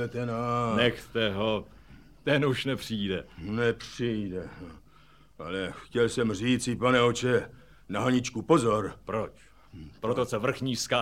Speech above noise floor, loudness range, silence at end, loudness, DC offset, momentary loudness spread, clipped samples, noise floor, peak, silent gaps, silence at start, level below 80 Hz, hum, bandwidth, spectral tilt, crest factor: 30 dB; 5 LU; 0 s; -28 LUFS; 0.1%; 12 LU; under 0.1%; -58 dBFS; -10 dBFS; none; 0 s; -54 dBFS; none; 16 kHz; -5 dB/octave; 20 dB